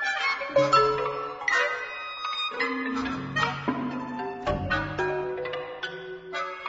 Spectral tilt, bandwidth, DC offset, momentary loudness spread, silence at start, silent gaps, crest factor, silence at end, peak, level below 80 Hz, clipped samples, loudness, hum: -4.5 dB/octave; 8 kHz; under 0.1%; 12 LU; 0 s; none; 20 dB; 0 s; -8 dBFS; -50 dBFS; under 0.1%; -27 LUFS; none